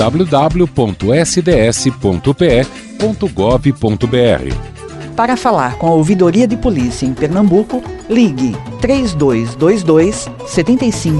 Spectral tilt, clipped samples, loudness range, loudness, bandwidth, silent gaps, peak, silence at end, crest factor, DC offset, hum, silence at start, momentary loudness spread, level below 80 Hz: -6 dB/octave; under 0.1%; 1 LU; -13 LUFS; 11.5 kHz; none; 0 dBFS; 0 s; 12 dB; under 0.1%; none; 0 s; 8 LU; -30 dBFS